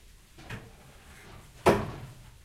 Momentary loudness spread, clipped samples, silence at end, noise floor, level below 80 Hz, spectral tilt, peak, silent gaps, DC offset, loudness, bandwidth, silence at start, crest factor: 26 LU; under 0.1%; 0.25 s; -52 dBFS; -50 dBFS; -6 dB/octave; -6 dBFS; none; under 0.1%; -28 LUFS; 16 kHz; 0.4 s; 26 dB